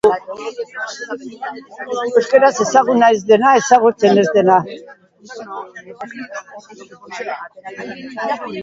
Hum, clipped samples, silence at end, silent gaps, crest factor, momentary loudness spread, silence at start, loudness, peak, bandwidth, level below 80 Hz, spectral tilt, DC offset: none; under 0.1%; 0 s; none; 16 dB; 20 LU; 0.05 s; -14 LUFS; 0 dBFS; 7.8 kHz; -62 dBFS; -4.5 dB/octave; under 0.1%